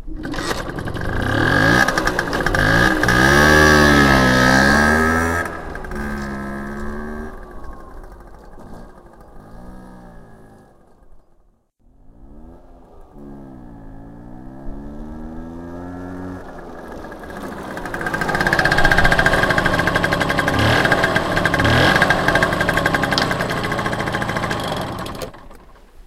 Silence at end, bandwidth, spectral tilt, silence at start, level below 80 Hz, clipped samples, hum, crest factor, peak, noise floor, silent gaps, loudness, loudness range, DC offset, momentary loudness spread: 0.05 s; 16.5 kHz; -4.5 dB/octave; 0 s; -30 dBFS; under 0.1%; none; 18 dB; 0 dBFS; -56 dBFS; none; -16 LUFS; 21 LU; under 0.1%; 22 LU